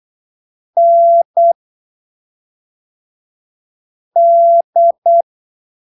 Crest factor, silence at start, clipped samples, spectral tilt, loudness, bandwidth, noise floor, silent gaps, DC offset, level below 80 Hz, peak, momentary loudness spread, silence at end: 10 dB; 0.75 s; under 0.1%; -8 dB/octave; -11 LUFS; 1 kHz; under -90 dBFS; 1.25-1.34 s, 1.55-4.11 s, 4.64-4.73 s, 4.98-5.02 s; under 0.1%; -88 dBFS; -4 dBFS; 11 LU; 0.75 s